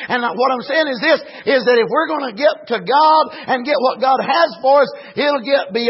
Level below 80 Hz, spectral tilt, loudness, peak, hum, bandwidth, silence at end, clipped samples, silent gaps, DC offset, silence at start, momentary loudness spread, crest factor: -70 dBFS; -7 dB/octave; -16 LUFS; -2 dBFS; none; 5.8 kHz; 0 s; under 0.1%; none; under 0.1%; 0 s; 6 LU; 14 dB